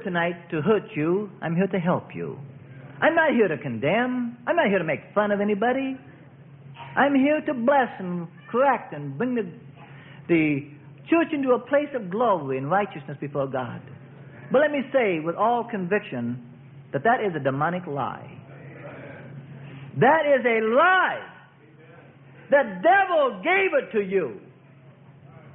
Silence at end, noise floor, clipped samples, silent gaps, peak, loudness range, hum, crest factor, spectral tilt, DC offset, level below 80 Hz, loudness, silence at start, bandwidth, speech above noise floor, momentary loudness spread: 0.05 s; -51 dBFS; under 0.1%; none; -6 dBFS; 4 LU; none; 18 dB; -11 dB/octave; under 0.1%; -68 dBFS; -23 LUFS; 0 s; 3.9 kHz; 28 dB; 21 LU